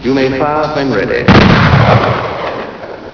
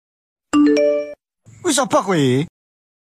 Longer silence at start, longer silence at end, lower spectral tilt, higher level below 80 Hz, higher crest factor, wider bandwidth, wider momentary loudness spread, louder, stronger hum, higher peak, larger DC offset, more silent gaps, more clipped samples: second, 0 s vs 0.55 s; second, 0.05 s vs 0.6 s; first, -7 dB/octave vs -5 dB/octave; first, -28 dBFS vs -60 dBFS; about the same, 10 dB vs 14 dB; second, 5.4 kHz vs 15 kHz; first, 15 LU vs 11 LU; first, -10 LUFS vs -17 LUFS; neither; first, 0 dBFS vs -4 dBFS; neither; neither; first, 0.8% vs under 0.1%